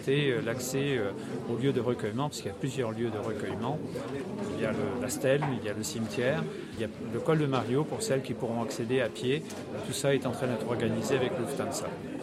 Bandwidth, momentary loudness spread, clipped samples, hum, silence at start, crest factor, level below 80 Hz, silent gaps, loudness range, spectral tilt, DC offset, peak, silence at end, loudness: 15 kHz; 8 LU; under 0.1%; none; 0 s; 18 dB; -64 dBFS; none; 2 LU; -5.5 dB/octave; under 0.1%; -12 dBFS; 0 s; -31 LUFS